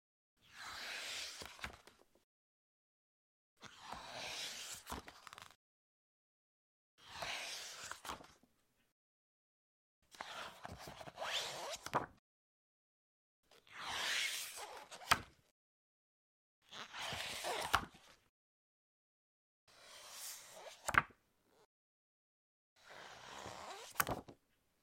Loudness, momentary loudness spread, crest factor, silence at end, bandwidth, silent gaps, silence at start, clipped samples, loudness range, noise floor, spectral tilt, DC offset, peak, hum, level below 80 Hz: -43 LUFS; 20 LU; 36 dB; 0.5 s; 16.5 kHz; 2.24-3.57 s, 5.55-6.98 s, 8.92-10.02 s, 12.19-13.43 s, 15.51-16.62 s, 18.29-19.67 s, 21.65-22.76 s; 0.45 s; under 0.1%; 9 LU; -76 dBFS; -1.5 dB/octave; under 0.1%; -12 dBFS; none; -70 dBFS